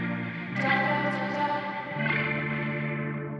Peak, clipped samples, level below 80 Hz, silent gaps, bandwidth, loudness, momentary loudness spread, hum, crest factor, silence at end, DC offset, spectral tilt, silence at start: -12 dBFS; under 0.1%; -64 dBFS; none; 7.6 kHz; -28 LUFS; 8 LU; none; 18 dB; 0 s; under 0.1%; -7.5 dB/octave; 0 s